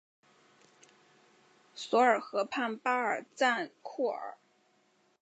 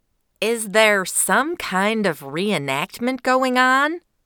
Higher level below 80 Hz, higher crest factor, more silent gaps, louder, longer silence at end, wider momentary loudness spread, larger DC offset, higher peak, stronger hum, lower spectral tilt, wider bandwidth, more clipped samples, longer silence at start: second, under -90 dBFS vs -62 dBFS; about the same, 22 dB vs 18 dB; neither; second, -31 LUFS vs -19 LUFS; first, 0.9 s vs 0.25 s; first, 16 LU vs 8 LU; neither; second, -12 dBFS vs -2 dBFS; neither; about the same, -3 dB/octave vs -3 dB/octave; second, 9 kHz vs 20 kHz; neither; first, 1.75 s vs 0.4 s